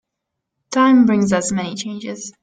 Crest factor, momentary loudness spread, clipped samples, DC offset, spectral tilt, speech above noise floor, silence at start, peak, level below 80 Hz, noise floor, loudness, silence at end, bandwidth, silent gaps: 14 dB; 15 LU; under 0.1%; under 0.1%; -5 dB/octave; 63 dB; 0.7 s; -4 dBFS; -56 dBFS; -79 dBFS; -16 LUFS; 0.1 s; 9.4 kHz; none